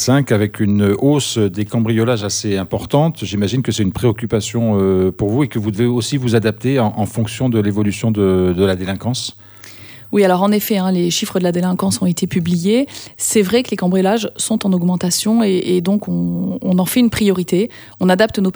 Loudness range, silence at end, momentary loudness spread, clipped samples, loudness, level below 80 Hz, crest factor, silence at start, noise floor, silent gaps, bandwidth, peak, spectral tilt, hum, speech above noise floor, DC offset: 1 LU; 0.05 s; 6 LU; under 0.1%; -16 LUFS; -46 dBFS; 16 dB; 0 s; -37 dBFS; none; over 20 kHz; 0 dBFS; -5.5 dB/octave; none; 21 dB; under 0.1%